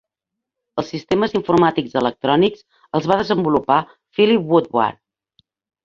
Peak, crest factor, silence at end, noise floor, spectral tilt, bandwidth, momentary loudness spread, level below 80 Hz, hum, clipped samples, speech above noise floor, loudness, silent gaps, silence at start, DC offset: -2 dBFS; 18 dB; 0.9 s; -83 dBFS; -7 dB/octave; 7.4 kHz; 10 LU; -54 dBFS; none; under 0.1%; 66 dB; -18 LUFS; none; 0.75 s; under 0.1%